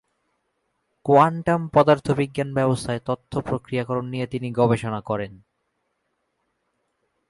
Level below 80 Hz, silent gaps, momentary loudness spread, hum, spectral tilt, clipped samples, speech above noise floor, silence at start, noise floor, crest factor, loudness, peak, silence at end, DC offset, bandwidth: -54 dBFS; none; 11 LU; none; -7 dB/octave; under 0.1%; 53 dB; 1.05 s; -74 dBFS; 20 dB; -22 LUFS; -4 dBFS; 1.95 s; under 0.1%; 11.5 kHz